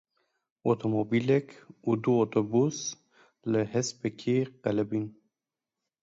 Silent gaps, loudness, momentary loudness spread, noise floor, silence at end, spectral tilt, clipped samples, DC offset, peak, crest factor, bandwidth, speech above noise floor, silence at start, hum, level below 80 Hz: none; -29 LUFS; 10 LU; -90 dBFS; 0.9 s; -6 dB/octave; under 0.1%; under 0.1%; -12 dBFS; 18 dB; 8 kHz; 62 dB; 0.65 s; none; -70 dBFS